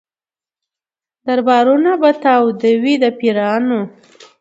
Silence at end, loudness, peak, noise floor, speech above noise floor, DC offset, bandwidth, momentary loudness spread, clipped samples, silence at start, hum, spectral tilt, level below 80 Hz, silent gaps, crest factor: 0.5 s; -14 LUFS; 0 dBFS; under -90 dBFS; over 77 dB; under 0.1%; 8 kHz; 8 LU; under 0.1%; 1.25 s; none; -6 dB/octave; -68 dBFS; none; 14 dB